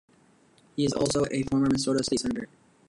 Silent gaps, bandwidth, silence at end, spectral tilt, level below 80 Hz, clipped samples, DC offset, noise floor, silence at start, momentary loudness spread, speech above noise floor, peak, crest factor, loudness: none; 11.5 kHz; 0.45 s; -5 dB/octave; -54 dBFS; under 0.1%; under 0.1%; -61 dBFS; 0.75 s; 11 LU; 34 dB; -12 dBFS; 16 dB; -27 LUFS